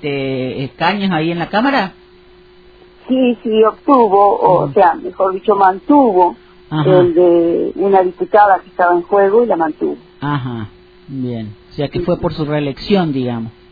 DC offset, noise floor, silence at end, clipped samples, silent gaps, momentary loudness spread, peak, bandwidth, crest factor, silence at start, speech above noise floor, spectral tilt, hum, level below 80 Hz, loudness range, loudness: under 0.1%; -44 dBFS; 0.2 s; under 0.1%; none; 13 LU; 0 dBFS; 5 kHz; 14 dB; 0 s; 30 dB; -9.5 dB/octave; none; -46 dBFS; 7 LU; -14 LUFS